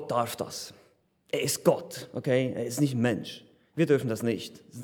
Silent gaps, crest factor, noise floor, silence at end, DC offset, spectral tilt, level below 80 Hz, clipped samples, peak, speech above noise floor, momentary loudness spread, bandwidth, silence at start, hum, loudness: none; 20 dB; -64 dBFS; 0 s; under 0.1%; -5 dB/octave; -74 dBFS; under 0.1%; -8 dBFS; 35 dB; 16 LU; over 20 kHz; 0 s; none; -29 LUFS